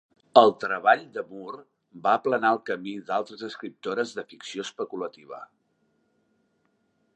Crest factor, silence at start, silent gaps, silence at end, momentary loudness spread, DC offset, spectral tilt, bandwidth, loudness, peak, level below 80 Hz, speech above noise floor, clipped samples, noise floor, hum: 26 dB; 0.35 s; none; 1.7 s; 20 LU; under 0.1%; -4.5 dB/octave; 8.8 kHz; -25 LUFS; -2 dBFS; -80 dBFS; 45 dB; under 0.1%; -71 dBFS; none